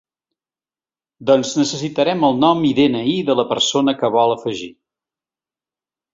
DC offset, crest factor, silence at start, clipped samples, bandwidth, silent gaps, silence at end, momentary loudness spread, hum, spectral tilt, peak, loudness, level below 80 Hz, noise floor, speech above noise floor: under 0.1%; 18 dB; 1.2 s; under 0.1%; 7.8 kHz; none; 1.45 s; 9 LU; none; -4.5 dB/octave; -2 dBFS; -17 LUFS; -58 dBFS; under -90 dBFS; over 74 dB